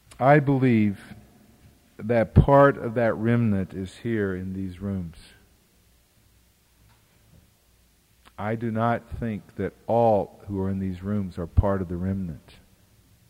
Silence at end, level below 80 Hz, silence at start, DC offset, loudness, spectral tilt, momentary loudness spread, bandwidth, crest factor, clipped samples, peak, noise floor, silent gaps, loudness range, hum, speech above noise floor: 0.9 s; -40 dBFS; 0.2 s; under 0.1%; -24 LUFS; -9 dB/octave; 15 LU; 15.5 kHz; 22 dB; under 0.1%; -4 dBFS; -61 dBFS; none; 15 LU; none; 38 dB